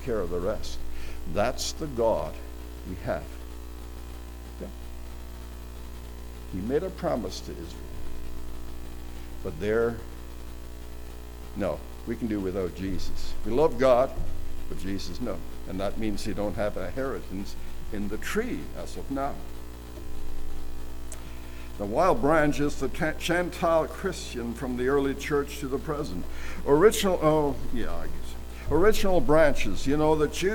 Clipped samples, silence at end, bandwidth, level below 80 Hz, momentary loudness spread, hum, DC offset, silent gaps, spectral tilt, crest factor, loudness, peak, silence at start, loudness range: under 0.1%; 0 s; 19 kHz; -36 dBFS; 19 LU; 60 Hz at -40 dBFS; under 0.1%; none; -5.5 dB/octave; 22 dB; -28 LUFS; -6 dBFS; 0 s; 10 LU